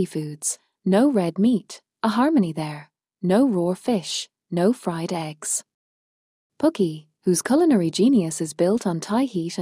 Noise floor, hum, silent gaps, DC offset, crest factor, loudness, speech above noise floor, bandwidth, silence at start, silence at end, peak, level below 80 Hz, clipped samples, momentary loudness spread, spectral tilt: under -90 dBFS; none; 5.74-6.50 s; under 0.1%; 14 dB; -22 LUFS; over 69 dB; 15.5 kHz; 0 s; 0 s; -8 dBFS; -66 dBFS; under 0.1%; 10 LU; -5.5 dB/octave